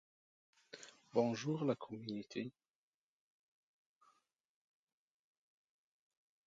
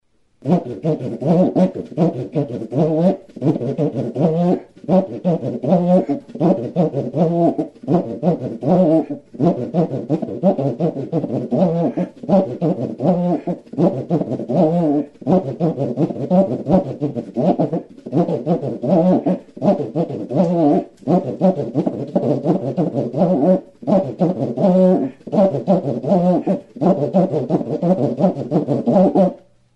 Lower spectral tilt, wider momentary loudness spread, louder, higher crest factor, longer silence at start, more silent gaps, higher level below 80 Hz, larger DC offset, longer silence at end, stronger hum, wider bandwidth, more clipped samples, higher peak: second, -6 dB/octave vs -10.5 dB/octave; first, 19 LU vs 7 LU; second, -41 LUFS vs -18 LUFS; first, 26 dB vs 16 dB; first, 0.75 s vs 0.45 s; neither; second, -88 dBFS vs -56 dBFS; neither; first, 3.95 s vs 0.4 s; neither; first, 7.8 kHz vs 6.6 kHz; neither; second, -20 dBFS vs -2 dBFS